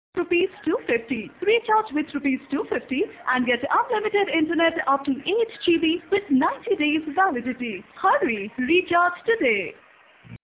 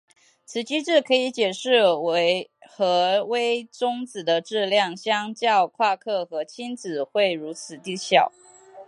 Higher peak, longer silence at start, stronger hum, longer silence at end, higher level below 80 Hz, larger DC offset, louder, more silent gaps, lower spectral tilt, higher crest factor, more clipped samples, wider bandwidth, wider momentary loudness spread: second, -8 dBFS vs -2 dBFS; second, 0.15 s vs 0.5 s; neither; about the same, 0.05 s vs 0.05 s; first, -60 dBFS vs -80 dBFS; neither; about the same, -23 LUFS vs -23 LUFS; neither; first, -8 dB/octave vs -3.5 dB/octave; about the same, 16 dB vs 20 dB; neither; second, 4 kHz vs 11.5 kHz; second, 6 LU vs 11 LU